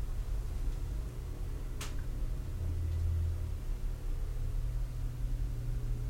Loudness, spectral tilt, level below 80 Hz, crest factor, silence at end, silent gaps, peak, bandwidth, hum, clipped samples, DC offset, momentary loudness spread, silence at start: -39 LUFS; -6.5 dB/octave; -36 dBFS; 10 dB; 0 s; none; -24 dBFS; 16 kHz; none; under 0.1%; under 0.1%; 6 LU; 0 s